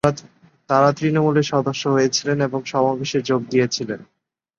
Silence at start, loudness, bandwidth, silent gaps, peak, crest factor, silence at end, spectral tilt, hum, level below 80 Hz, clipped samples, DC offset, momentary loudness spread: 0.05 s; -20 LUFS; 10.5 kHz; none; -2 dBFS; 18 dB; 0.55 s; -5 dB/octave; none; -58 dBFS; under 0.1%; under 0.1%; 7 LU